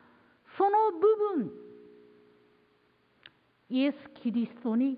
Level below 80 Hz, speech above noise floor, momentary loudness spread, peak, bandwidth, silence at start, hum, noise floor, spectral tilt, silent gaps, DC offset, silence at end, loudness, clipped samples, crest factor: -82 dBFS; 40 dB; 13 LU; -14 dBFS; 5 kHz; 0.55 s; none; -68 dBFS; -10 dB/octave; none; under 0.1%; 0 s; -29 LUFS; under 0.1%; 16 dB